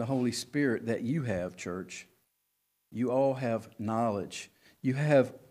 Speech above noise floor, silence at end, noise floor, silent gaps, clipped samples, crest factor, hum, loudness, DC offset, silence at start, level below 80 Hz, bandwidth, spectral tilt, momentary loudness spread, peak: 48 dB; 0.1 s; -79 dBFS; none; under 0.1%; 20 dB; none; -31 LUFS; under 0.1%; 0 s; -68 dBFS; 15.5 kHz; -6 dB/octave; 16 LU; -12 dBFS